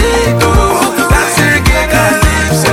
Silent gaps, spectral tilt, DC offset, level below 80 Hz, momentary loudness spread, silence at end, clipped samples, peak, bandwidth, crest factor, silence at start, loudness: none; -4.5 dB/octave; under 0.1%; -16 dBFS; 2 LU; 0 s; under 0.1%; 0 dBFS; 17 kHz; 10 dB; 0 s; -9 LUFS